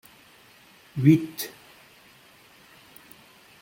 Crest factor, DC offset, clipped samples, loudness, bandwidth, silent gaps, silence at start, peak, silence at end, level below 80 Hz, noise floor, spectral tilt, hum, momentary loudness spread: 24 dB; under 0.1%; under 0.1%; -24 LUFS; 16.5 kHz; none; 0.95 s; -4 dBFS; 2.15 s; -66 dBFS; -54 dBFS; -7 dB/octave; none; 28 LU